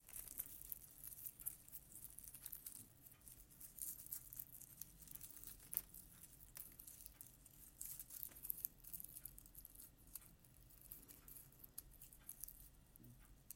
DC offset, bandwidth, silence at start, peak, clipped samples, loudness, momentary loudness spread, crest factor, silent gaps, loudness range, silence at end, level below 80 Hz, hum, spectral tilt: under 0.1%; 17 kHz; 0 s; -18 dBFS; under 0.1%; -53 LUFS; 14 LU; 38 dB; none; 6 LU; 0 s; -70 dBFS; none; -2 dB/octave